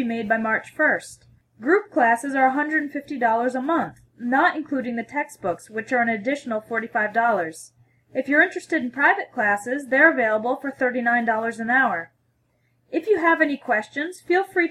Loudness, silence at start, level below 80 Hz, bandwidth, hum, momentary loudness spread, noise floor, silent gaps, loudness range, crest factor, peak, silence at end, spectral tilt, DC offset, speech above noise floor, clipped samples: -22 LUFS; 0 s; -68 dBFS; 14 kHz; none; 11 LU; -67 dBFS; none; 4 LU; 20 dB; -4 dBFS; 0 s; -5 dB/octave; under 0.1%; 45 dB; under 0.1%